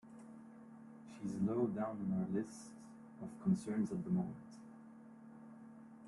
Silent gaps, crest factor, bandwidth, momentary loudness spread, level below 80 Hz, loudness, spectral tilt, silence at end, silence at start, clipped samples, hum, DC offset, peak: none; 18 dB; 11.5 kHz; 20 LU; -76 dBFS; -40 LUFS; -8.5 dB/octave; 0 s; 0.05 s; under 0.1%; none; under 0.1%; -24 dBFS